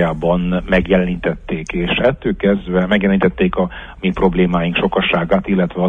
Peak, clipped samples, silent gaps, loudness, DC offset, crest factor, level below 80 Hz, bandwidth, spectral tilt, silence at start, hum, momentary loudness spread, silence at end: -2 dBFS; under 0.1%; none; -16 LUFS; under 0.1%; 14 dB; -32 dBFS; 7.2 kHz; -8 dB/octave; 0 s; none; 7 LU; 0 s